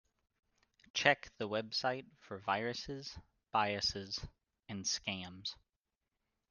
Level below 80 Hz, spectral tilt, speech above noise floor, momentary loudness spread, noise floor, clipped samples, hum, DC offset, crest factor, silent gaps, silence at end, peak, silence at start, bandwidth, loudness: -66 dBFS; -2.5 dB/octave; 51 dB; 17 LU; -90 dBFS; under 0.1%; none; under 0.1%; 30 dB; none; 0.95 s; -12 dBFS; 0.95 s; 11 kHz; -37 LUFS